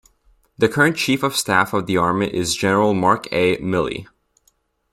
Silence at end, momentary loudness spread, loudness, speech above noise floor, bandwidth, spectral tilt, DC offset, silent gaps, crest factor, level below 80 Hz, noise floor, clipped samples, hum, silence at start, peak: 0.9 s; 5 LU; -18 LUFS; 45 dB; 16 kHz; -4.5 dB/octave; under 0.1%; none; 18 dB; -52 dBFS; -63 dBFS; under 0.1%; none; 0.6 s; 0 dBFS